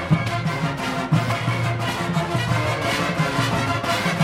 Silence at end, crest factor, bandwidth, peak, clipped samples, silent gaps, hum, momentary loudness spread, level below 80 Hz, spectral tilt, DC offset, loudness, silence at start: 0 s; 16 dB; 16 kHz; -6 dBFS; under 0.1%; none; none; 3 LU; -46 dBFS; -5.5 dB/octave; under 0.1%; -22 LUFS; 0 s